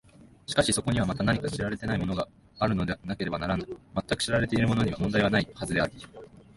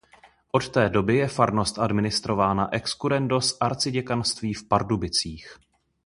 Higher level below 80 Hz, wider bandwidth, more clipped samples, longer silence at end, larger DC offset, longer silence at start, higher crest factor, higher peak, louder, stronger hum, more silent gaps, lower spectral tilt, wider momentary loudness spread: about the same, -46 dBFS vs -48 dBFS; about the same, 11.5 kHz vs 11.5 kHz; neither; second, 0.15 s vs 0.55 s; neither; second, 0.25 s vs 0.55 s; about the same, 20 dB vs 22 dB; second, -10 dBFS vs -4 dBFS; second, -28 LUFS vs -24 LUFS; neither; neither; about the same, -5 dB/octave vs -4.5 dB/octave; first, 9 LU vs 5 LU